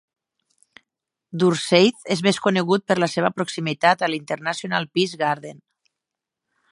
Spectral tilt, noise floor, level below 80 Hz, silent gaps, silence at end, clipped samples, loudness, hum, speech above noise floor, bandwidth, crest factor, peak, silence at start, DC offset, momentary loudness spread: -5 dB/octave; -85 dBFS; -70 dBFS; none; 1.15 s; under 0.1%; -21 LUFS; none; 64 dB; 11.5 kHz; 22 dB; -2 dBFS; 1.35 s; under 0.1%; 9 LU